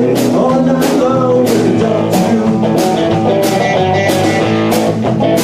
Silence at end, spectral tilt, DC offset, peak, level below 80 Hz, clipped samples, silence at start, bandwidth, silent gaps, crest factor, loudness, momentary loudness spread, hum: 0 s; -6 dB/octave; 0.2%; -2 dBFS; -44 dBFS; under 0.1%; 0 s; 16 kHz; none; 10 dB; -12 LUFS; 1 LU; none